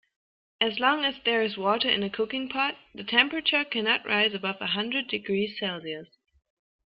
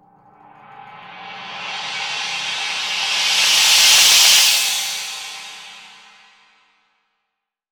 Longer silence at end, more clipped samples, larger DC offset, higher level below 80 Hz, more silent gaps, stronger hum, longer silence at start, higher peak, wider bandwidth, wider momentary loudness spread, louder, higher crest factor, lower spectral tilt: second, 0.85 s vs 1.85 s; neither; neither; about the same, -68 dBFS vs -64 dBFS; neither; neither; second, 0.6 s vs 0.75 s; second, -6 dBFS vs -2 dBFS; second, 5.6 kHz vs over 20 kHz; second, 8 LU vs 24 LU; second, -26 LUFS vs -13 LUFS; about the same, 22 dB vs 18 dB; first, -7.5 dB/octave vs 3.5 dB/octave